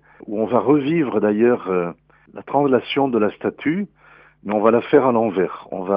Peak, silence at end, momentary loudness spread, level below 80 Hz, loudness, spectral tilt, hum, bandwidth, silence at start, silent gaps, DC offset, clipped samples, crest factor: -2 dBFS; 0 s; 13 LU; -62 dBFS; -19 LUFS; -11 dB/octave; none; 5.2 kHz; 0.25 s; none; under 0.1%; under 0.1%; 18 dB